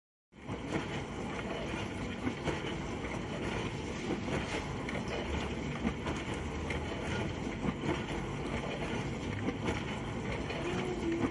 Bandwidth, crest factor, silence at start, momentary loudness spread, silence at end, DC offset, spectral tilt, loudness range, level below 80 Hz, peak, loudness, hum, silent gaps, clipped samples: 11.5 kHz; 18 dB; 0.35 s; 3 LU; 0 s; under 0.1%; -5.5 dB/octave; 1 LU; -48 dBFS; -20 dBFS; -37 LUFS; none; none; under 0.1%